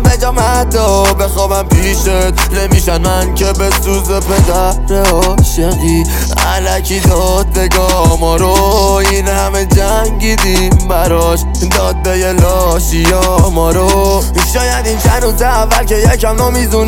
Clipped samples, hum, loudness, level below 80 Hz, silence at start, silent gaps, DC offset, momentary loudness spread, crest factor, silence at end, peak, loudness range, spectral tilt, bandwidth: under 0.1%; none; -11 LUFS; -14 dBFS; 0 s; none; under 0.1%; 3 LU; 10 dB; 0 s; 0 dBFS; 1 LU; -4.5 dB/octave; 17.5 kHz